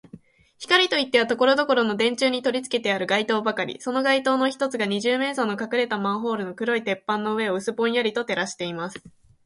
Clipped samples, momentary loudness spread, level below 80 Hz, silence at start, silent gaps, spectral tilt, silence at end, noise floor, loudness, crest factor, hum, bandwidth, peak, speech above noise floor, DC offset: under 0.1%; 8 LU; -68 dBFS; 0.15 s; none; -4 dB/octave; 0.35 s; -48 dBFS; -23 LUFS; 20 dB; none; 11.5 kHz; -4 dBFS; 25 dB; under 0.1%